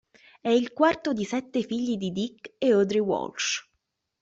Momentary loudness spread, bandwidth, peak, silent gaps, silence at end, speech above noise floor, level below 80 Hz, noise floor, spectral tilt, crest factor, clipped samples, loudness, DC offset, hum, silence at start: 9 LU; 8 kHz; -8 dBFS; none; 0.6 s; 53 dB; -66 dBFS; -79 dBFS; -4.5 dB/octave; 20 dB; under 0.1%; -26 LUFS; under 0.1%; none; 0.45 s